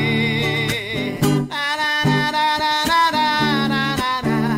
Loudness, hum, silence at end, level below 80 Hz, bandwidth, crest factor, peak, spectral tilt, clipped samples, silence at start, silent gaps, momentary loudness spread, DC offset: -18 LUFS; none; 0 s; -46 dBFS; 16 kHz; 12 dB; -6 dBFS; -4.5 dB/octave; under 0.1%; 0 s; none; 5 LU; under 0.1%